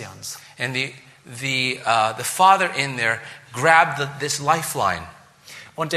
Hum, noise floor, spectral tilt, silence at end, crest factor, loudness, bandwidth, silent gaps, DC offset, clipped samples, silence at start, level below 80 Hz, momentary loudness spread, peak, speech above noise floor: none; -44 dBFS; -3 dB/octave; 0 s; 20 dB; -20 LUFS; 14.5 kHz; none; under 0.1%; under 0.1%; 0 s; -60 dBFS; 18 LU; -2 dBFS; 23 dB